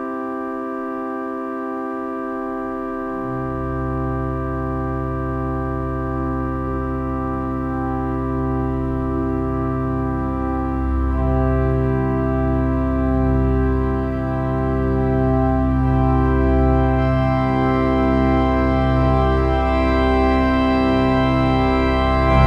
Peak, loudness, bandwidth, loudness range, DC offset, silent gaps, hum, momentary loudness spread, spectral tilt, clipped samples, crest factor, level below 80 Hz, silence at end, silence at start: -2 dBFS; -20 LUFS; 5.6 kHz; 7 LU; under 0.1%; none; none; 9 LU; -9 dB/octave; under 0.1%; 18 dB; -24 dBFS; 0 s; 0 s